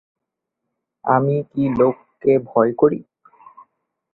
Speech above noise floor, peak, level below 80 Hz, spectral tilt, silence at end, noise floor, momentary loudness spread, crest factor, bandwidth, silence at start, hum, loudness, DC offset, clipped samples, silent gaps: 64 dB; -2 dBFS; -56 dBFS; -11.5 dB/octave; 1.1 s; -81 dBFS; 6 LU; 18 dB; 4.1 kHz; 1.05 s; none; -19 LUFS; under 0.1%; under 0.1%; none